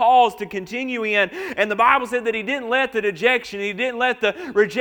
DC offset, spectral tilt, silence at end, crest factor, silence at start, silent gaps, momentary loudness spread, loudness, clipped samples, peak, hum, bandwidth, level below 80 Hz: under 0.1%; -4 dB/octave; 0 s; 20 dB; 0 s; none; 9 LU; -20 LUFS; under 0.1%; 0 dBFS; none; 19 kHz; -60 dBFS